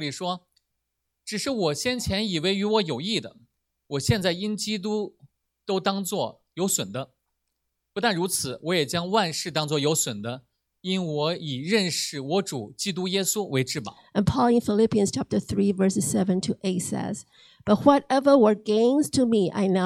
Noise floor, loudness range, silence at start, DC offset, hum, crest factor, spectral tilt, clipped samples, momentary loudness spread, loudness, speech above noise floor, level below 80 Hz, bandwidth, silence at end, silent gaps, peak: -80 dBFS; 6 LU; 0 s; under 0.1%; none; 20 dB; -4.5 dB/octave; under 0.1%; 12 LU; -25 LUFS; 56 dB; -54 dBFS; 16 kHz; 0 s; none; -6 dBFS